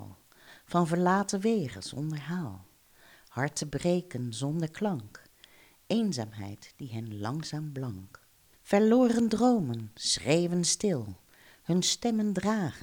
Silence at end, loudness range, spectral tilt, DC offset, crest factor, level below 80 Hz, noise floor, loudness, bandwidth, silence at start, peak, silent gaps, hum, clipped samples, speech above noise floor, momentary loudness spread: 0 s; 8 LU; -5 dB/octave; under 0.1%; 18 dB; -62 dBFS; -59 dBFS; -29 LUFS; over 20 kHz; 0 s; -12 dBFS; none; none; under 0.1%; 30 dB; 16 LU